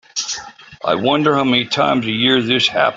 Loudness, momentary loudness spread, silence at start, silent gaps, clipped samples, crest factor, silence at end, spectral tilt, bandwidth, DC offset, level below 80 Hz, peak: -16 LUFS; 10 LU; 0.15 s; none; under 0.1%; 14 dB; 0 s; -3.5 dB/octave; 7.8 kHz; under 0.1%; -56 dBFS; -2 dBFS